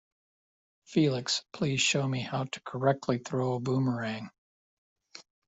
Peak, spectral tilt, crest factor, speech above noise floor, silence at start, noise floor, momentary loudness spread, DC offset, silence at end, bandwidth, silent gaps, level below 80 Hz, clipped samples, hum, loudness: -12 dBFS; -4.5 dB/octave; 20 dB; over 60 dB; 0.9 s; under -90 dBFS; 9 LU; under 0.1%; 0.25 s; 8.2 kHz; 4.38-4.96 s; -68 dBFS; under 0.1%; none; -30 LUFS